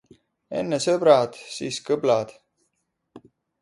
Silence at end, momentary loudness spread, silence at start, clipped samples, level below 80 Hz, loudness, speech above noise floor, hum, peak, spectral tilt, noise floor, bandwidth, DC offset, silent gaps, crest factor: 0.45 s; 15 LU; 0.5 s; under 0.1%; -68 dBFS; -23 LUFS; 54 dB; none; -4 dBFS; -4.5 dB/octave; -76 dBFS; 11.5 kHz; under 0.1%; none; 22 dB